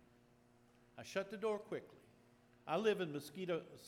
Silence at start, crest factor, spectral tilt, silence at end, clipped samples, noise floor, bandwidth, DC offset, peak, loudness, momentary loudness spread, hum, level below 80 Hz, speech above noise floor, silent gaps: 0.95 s; 20 dB; -5 dB/octave; 0 s; under 0.1%; -70 dBFS; 16 kHz; under 0.1%; -24 dBFS; -42 LUFS; 19 LU; none; -84 dBFS; 28 dB; none